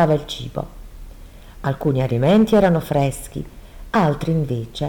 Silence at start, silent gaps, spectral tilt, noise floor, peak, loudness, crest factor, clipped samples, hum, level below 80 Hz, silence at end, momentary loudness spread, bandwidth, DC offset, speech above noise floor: 0 s; none; -7 dB/octave; -39 dBFS; -4 dBFS; -19 LUFS; 14 dB; under 0.1%; none; -38 dBFS; 0 s; 16 LU; 19.5 kHz; under 0.1%; 21 dB